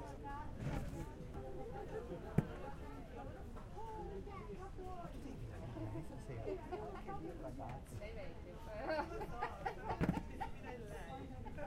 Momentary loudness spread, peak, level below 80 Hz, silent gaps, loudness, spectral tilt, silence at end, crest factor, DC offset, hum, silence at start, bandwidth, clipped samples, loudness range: 10 LU; -18 dBFS; -52 dBFS; none; -47 LUFS; -7 dB/octave; 0 s; 28 dB; under 0.1%; none; 0 s; 16 kHz; under 0.1%; 5 LU